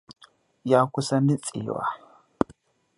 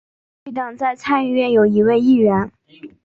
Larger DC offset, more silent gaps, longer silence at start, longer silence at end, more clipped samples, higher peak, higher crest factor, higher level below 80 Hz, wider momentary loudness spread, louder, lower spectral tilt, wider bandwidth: neither; neither; second, 0.1 s vs 0.45 s; first, 1 s vs 0.15 s; neither; about the same, -4 dBFS vs -4 dBFS; first, 24 dB vs 14 dB; second, -62 dBFS vs -56 dBFS; second, 10 LU vs 13 LU; second, -25 LUFS vs -16 LUFS; second, -6.5 dB/octave vs -8 dB/octave; first, 11.5 kHz vs 7.4 kHz